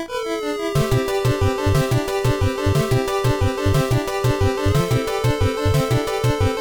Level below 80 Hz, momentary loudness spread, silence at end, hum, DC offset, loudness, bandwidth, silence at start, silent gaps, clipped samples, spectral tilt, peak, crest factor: -32 dBFS; 2 LU; 0 s; none; under 0.1%; -20 LUFS; 19 kHz; 0 s; none; under 0.1%; -6 dB/octave; -6 dBFS; 14 dB